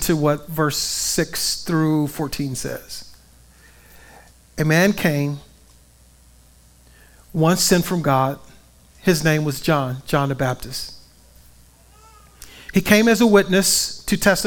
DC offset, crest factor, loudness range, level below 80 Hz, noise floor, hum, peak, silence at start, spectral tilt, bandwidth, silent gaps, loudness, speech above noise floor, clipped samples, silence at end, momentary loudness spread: under 0.1%; 20 dB; 6 LU; -44 dBFS; -51 dBFS; none; 0 dBFS; 0 s; -4.5 dB/octave; 18 kHz; none; -19 LUFS; 32 dB; under 0.1%; 0 s; 15 LU